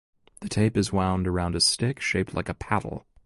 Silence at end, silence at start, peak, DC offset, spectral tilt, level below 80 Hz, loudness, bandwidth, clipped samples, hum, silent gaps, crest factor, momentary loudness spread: 0.25 s; 0.4 s; -8 dBFS; under 0.1%; -4.5 dB/octave; -42 dBFS; -25 LUFS; 11.5 kHz; under 0.1%; none; none; 18 dB; 10 LU